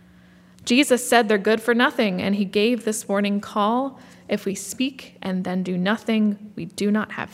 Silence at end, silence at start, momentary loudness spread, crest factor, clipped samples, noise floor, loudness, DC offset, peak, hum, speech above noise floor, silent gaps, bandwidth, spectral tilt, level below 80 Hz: 0.05 s; 0.65 s; 11 LU; 22 dB; under 0.1%; -51 dBFS; -22 LUFS; under 0.1%; 0 dBFS; none; 29 dB; none; 16 kHz; -4.5 dB/octave; -68 dBFS